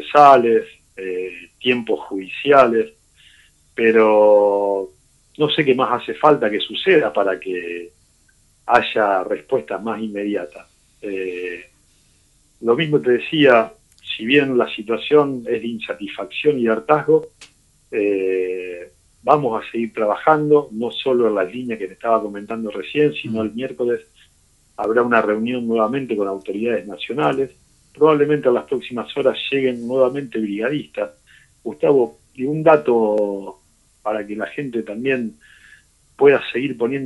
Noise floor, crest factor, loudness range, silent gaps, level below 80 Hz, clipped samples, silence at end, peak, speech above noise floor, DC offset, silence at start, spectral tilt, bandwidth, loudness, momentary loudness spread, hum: -57 dBFS; 18 dB; 5 LU; none; -60 dBFS; under 0.1%; 0 s; 0 dBFS; 39 dB; under 0.1%; 0 s; -6.5 dB/octave; 11.5 kHz; -18 LUFS; 14 LU; none